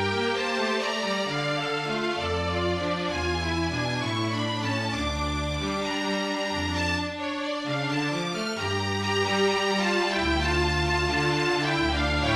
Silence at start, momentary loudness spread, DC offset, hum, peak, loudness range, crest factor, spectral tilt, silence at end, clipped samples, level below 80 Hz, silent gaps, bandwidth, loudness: 0 s; 4 LU; under 0.1%; none; -10 dBFS; 4 LU; 16 dB; -4.5 dB/octave; 0 s; under 0.1%; -40 dBFS; none; 13.5 kHz; -26 LUFS